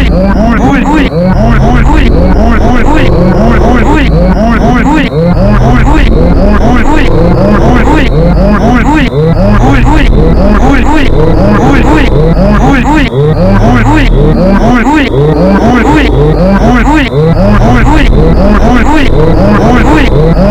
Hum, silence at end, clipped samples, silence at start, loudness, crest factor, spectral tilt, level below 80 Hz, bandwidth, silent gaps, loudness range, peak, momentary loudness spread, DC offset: none; 0 s; 20%; 0 s; -6 LUFS; 4 dB; -7.5 dB/octave; -8 dBFS; 9.4 kHz; none; 1 LU; 0 dBFS; 2 LU; 0.9%